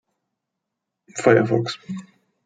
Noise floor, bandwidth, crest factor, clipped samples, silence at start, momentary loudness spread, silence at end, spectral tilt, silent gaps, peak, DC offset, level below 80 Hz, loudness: -82 dBFS; 9.4 kHz; 22 dB; under 0.1%; 1.15 s; 18 LU; 0.45 s; -6 dB/octave; none; -2 dBFS; under 0.1%; -66 dBFS; -19 LUFS